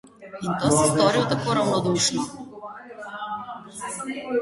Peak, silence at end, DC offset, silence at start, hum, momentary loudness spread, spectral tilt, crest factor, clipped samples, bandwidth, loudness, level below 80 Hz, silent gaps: -6 dBFS; 0 s; under 0.1%; 0.05 s; none; 19 LU; -4 dB/octave; 20 dB; under 0.1%; 12 kHz; -23 LUFS; -56 dBFS; none